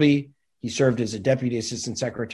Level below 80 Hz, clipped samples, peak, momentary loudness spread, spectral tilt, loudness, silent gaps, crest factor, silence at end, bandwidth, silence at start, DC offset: -56 dBFS; under 0.1%; -6 dBFS; 10 LU; -5.5 dB/octave; -24 LUFS; none; 18 dB; 0 s; 11.5 kHz; 0 s; under 0.1%